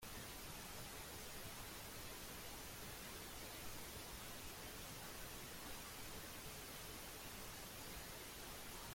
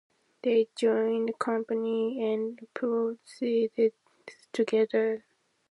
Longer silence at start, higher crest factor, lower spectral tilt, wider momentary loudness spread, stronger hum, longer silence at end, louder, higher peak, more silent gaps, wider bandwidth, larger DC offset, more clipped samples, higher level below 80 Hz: second, 0 s vs 0.45 s; about the same, 14 dB vs 16 dB; second, -2.5 dB/octave vs -5.5 dB/octave; second, 0 LU vs 8 LU; neither; second, 0 s vs 0.55 s; second, -51 LUFS vs -29 LUFS; second, -38 dBFS vs -12 dBFS; neither; first, 16.5 kHz vs 11 kHz; neither; neither; first, -62 dBFS vs -86 dBFS